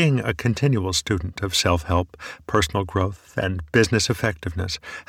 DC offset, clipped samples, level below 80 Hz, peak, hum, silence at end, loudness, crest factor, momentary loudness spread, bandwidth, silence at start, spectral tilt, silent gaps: under 0.1%; under 0.1%; -40 dBFS; -4 dBFS; none; 0.05 s; -23 LUFS; 20 dB; 8 LU; 16.5 kHz; 0 s; -4.5 dB/octave; none